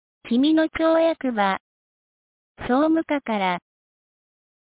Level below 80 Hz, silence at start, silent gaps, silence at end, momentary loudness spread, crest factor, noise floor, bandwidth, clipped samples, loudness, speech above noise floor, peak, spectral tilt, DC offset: -56 dBFS; 0.25 s; 1.60-2.55 s; 1.2 s; 7 LU; 16 dB; under -90 dBFS; 4 kHz; under 0.1%; -22 LUFS; over 69 dB; -8 dBFS; -9.5 dB/octave; under 0.1%